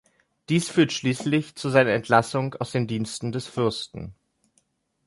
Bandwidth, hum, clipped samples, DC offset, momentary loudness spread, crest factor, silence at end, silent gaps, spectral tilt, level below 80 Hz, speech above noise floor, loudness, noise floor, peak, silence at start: 11.5 kHz; none; under 0.1%; under 0.1%; 11 LU; 22 dB; 0.95 s; none; -5.5 dB/octave; -58 dBFS; 45 dB; -24 LUFS; -69 dBFS; -4 dBFS; 0.5 s